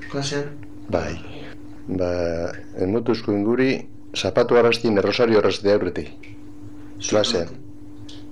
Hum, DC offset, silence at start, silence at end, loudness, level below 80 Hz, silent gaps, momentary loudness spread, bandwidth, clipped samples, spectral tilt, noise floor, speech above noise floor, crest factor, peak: none; 2%; 0 s; 0 s; -21 LUFS; -48 dBFS; none; 23 LU; 11.5 kHz; under 0.1%; -5 dB/octave; -40 dBFS; 19 dB; 18 dB; -4 dBFS